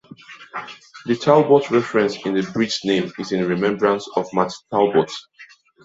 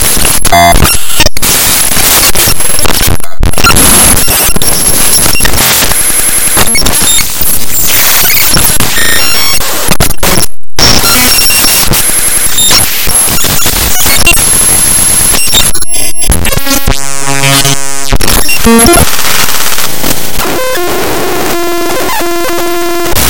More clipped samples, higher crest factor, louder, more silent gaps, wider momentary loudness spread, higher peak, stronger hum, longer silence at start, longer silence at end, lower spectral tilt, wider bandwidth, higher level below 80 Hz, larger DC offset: second, under 0.1% vs 9%; first, 18 dB vs 8 dB; second, -19 LUFS vs -5 LUFS; neither; first, 17 LU vs 8 LU; about the same, -2 dBFS vs 0 dBFS; neither; about the same, 0.1 s vs 0 s; first, 0.4 s vs 0 s; first, -5.5 dB/octave vs -2 dB/octave; second, 8 kHz vs over 20 kHz; second, -62 dBFS vs -18 dBFS; second, under 0.1% vs 30%